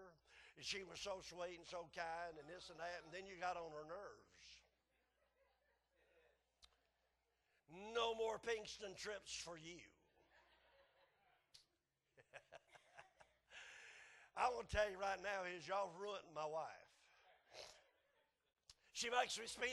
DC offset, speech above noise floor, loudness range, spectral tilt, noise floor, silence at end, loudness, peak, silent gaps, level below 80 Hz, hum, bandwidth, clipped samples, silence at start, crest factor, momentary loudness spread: under 0.1%; 41 dB; 18 LU; -2 dB/octave; -89 dBFS; 0 s; -47 LUFS; -26 dBFS; none; -72 dBFS; none; 12 kHz; under 0.1%; 0 s; 24 dB; 22 LU